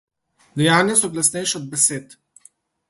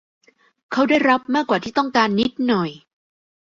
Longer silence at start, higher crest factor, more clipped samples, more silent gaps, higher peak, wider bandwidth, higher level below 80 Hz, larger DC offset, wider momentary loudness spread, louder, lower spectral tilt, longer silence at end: second, 0.55 s vs 0.7 s; about the same, 20 dB vs 18 dB; neither; neither; about the same, -2 dBFS vs -2 dBFS; first, 12 kHz vs 7.6 kHz; about the same, -62 dBFS vs -58 dBFS; neither; first, 11 LU vs 6 LU; about the same, -17 LUFS vs -19 LUFS; second, -3 dB/octave vs -5.5 dB/octave; about the same, 0.75 s vs 0.75 s